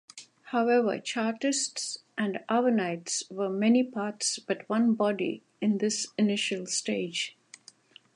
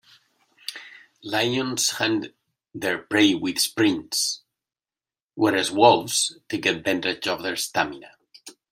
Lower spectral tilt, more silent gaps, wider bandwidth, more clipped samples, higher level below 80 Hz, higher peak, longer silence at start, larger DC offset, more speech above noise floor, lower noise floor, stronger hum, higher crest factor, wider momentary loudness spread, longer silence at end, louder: about the same, -3.5 dB/octave vs -2.5 dB/octave; second, none vs 5.22-5.30 s; second, 11.5 kHz vs 16 kHz; neither; second, -82 dBFS vs -68 dBFS; second, -14 dBFS vs -2 dBFS; second, 0.15 s vs 0.7 s; neither; second, 28 dB vs over 67 dB; second, -56 dBFS vs under -90 dBFS; neither; second, 16 dB vs 22 dB; second, 8 LU vs 18 LU; first, 0.85 s vs 0.2 s; second, -28 LUFS vs -22 LUFS